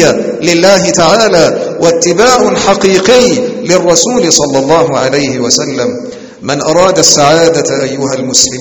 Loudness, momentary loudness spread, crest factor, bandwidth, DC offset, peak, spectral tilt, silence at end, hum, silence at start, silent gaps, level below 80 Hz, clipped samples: -8 LUFS; 8 LU; 8 dB; over 20 kHz; under 0.1%; 0 dBFS; -3 dB/octave; 0 s; none; 0 s; none; -40 dBFS; 2%